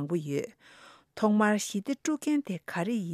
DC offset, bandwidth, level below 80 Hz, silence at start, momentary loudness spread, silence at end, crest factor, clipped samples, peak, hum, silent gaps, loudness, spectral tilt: under 0.1%; 14.5 kHz; -76 dBFS; 0 s; 10 LU; 0 s; 18 dB; under 0.1%; -12 dBFS; none; none; -29 LUFS; -5.5 dB/octave